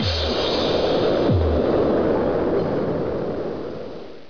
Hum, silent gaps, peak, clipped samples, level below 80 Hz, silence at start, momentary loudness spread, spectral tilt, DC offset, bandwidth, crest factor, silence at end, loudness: none; none; -10 dBFS; under 0.1%; -34 dBFS; 0 s; 10 LU; -7 dB/octave; 1%; 5.4 kHz; 12 dB; 0.05 s; -21 LUFS